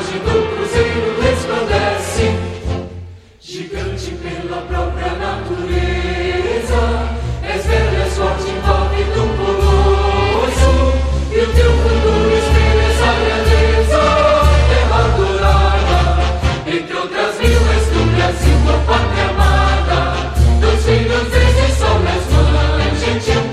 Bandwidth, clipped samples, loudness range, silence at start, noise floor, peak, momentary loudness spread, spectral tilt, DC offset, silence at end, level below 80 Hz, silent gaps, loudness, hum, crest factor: 12.5 kHz; under 0.1%; 8 LU; 0 s; -35 dBFS; 0 dBFS; 9 LU; -5.5 dB/octave; under 0.1%; 0 s; -16 dBFS; none; -15 LUFS; none; 12 dB